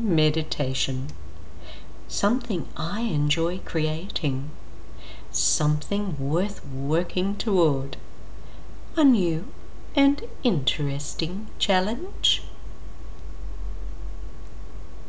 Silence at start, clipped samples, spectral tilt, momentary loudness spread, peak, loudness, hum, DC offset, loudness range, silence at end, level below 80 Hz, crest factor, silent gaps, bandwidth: 0 s; under 0.1%; -4.5 dB/octave; 20 LU; -10 dBFS; -25 LUFS; none; 5%; 3 LU; 0 s; -40 dBFS; 18 dB; none; 8 kHz